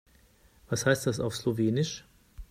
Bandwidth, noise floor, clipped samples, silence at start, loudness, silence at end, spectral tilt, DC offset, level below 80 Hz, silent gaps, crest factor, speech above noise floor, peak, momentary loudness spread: 16 kHz; -61 dBFS; under 0.1%; 0.7 s; -29 LUFS; 0.05 s; -5 dB/octave; under 0.1%; -54 dBFS; none; 20 dB; 33 dB; -10 dBFS; 8 LU